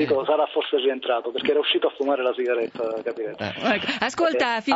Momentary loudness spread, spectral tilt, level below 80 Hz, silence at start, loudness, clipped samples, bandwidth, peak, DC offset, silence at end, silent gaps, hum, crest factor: 7 LU; -4 dB/octave; -68 dBFS; 0 s; -23 LUFS; under 0.1%; 8 kHz; -4 dBFS; under 0.1%; 0 s; none; none; 18 dB